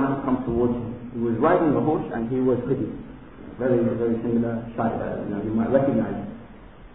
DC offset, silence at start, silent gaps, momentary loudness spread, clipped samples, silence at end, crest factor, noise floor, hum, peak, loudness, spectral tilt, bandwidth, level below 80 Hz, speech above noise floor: 0.3%; 0 s; none; 13 LU; under 0.1%; 0 s; 18 dB; -45 dBFS; none; -6 dBFS; -24 LUFS; -12.5 dB/octave; 3.9 kHz; -46 dBFS; 22 dB